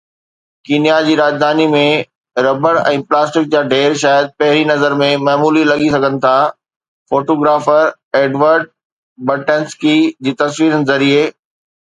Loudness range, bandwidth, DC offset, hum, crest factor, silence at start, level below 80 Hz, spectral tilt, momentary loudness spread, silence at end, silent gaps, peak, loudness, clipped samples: 2 LU; 9.4 kHz; under 0.1%; none; 14 dB; 0.7 s; -58 dBFS; -5 dB/octave; 6 LU; 0.55 s; 2.15-2.21 s, 6.76-6.80 s, 6.88-7.06 s, 8.03-8.11 s, 8.85-9.16 s; 0 dBFS; -13 LUFS; under 0.1%